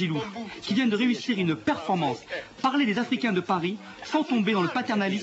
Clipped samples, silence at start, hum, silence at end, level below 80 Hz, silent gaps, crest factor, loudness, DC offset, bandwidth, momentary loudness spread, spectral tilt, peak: under 0.1%; 0 s; none; 0 s; -66 dBFS; none; 16 dB; -26 LUFS; under 0.1%; 8.2 kHz; 9 LU; -6 dB/octave; -10 dBFS